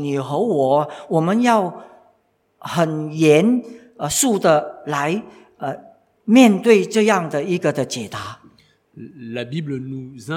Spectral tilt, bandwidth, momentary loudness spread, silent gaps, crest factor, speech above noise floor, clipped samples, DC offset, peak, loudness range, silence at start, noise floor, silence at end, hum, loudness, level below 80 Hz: -5 dB/octave; 16.5 kHz; 17 LU; none; 20 dB; 45 dB; under 0.1%; under 0.1%; 0 dBFS; 3 LU; 0 s; -63 dBFS; 0 s; none; -18 LUFS; -62 dBFS